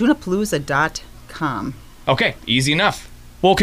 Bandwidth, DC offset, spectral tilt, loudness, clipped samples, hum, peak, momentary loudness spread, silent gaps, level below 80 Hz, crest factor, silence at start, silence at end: 15.5 kHz; under 0.1%; -4.5 dB/octave; -19 LUFS; under 0.1%; none; -4 dBFS; 14 LU; none; -42 dBFS; 16 dB; 0 s; 0 s